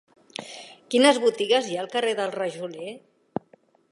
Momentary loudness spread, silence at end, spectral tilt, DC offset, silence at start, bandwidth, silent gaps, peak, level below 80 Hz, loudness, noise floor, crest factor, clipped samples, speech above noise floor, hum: 20 LU; 0.95 s; -3 dB/octave; under 0.1%; 0.4 s; 11.5 kHz; none; -4 dBFS; -78 dBFS; -23 LUFS; -59 dBFS; 22 dB; under 0.1%; 35 dB; none